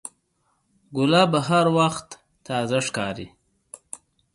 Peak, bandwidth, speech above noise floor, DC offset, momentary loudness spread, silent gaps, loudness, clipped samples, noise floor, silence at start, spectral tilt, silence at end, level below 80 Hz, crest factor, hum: -4 dBFS; 11.5 kHz; 48 dB; under 0.1%; 22 LU; none; -22 LUFS; under 0.1%; -70 dBFS; 0.05 s; -5 dB/octave; 0.4 s; -60 dBFS; 20 dB; none